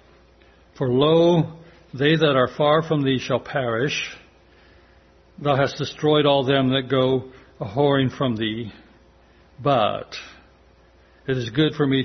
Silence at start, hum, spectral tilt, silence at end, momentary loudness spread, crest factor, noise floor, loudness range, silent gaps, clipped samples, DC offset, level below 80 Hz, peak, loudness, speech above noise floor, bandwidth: 0.75 s; none; -6.5 dB/octave; 0 s; 13 LU; 18 dB; -54 dBFS; 5 LU; none; under 0.1%; under 0.1%; -54 dBFS; -4 dBFS; -21 LUFS; 33 dB; 6.4 kHz